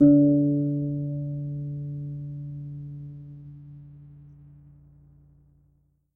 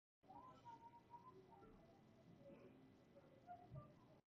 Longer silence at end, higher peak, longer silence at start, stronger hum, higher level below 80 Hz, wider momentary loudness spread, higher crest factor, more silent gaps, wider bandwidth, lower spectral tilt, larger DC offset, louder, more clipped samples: first, 1.7 s vs 0.1 s; first, -8 dBFS vs -46 dBFS; second, 0 s vs 0.25 s; first, 60 Hz at -60 dBFS vs none; first, -58 dBFS vs -82 dBFS; first, 25 LU vs 8 LU; about the same, 20 dB vs 18 dB; neither; second, 1.5 kHz vs 7 kHz; first, -14.5 dB/octave vs -6.5 dB/octave; neither; first, -26 LUFS vs -65 LUFS; neither